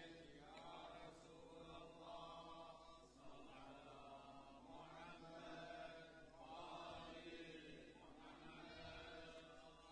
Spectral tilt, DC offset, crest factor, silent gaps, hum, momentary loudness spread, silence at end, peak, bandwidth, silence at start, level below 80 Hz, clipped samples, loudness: -4.5 dB/octave; under 0.1%; 14 dB; none; none; 7 LU; 0 s; -44 dBFS; 10 kHz; 0 s; -74 dBFS; under 0.1%; -59 LUFS